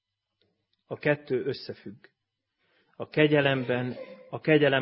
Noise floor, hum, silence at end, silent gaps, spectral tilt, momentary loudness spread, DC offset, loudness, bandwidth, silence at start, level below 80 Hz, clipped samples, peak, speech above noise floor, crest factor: -79 dBFS; none; 0 s; none; -10.5 dB/octave; 20 LU; under 0.1%; -27 LUFS; 5.8 kHz; 0.9 s; -68 dBFS; under 0.1%; -8 dBFS; 53 dB; 22 dB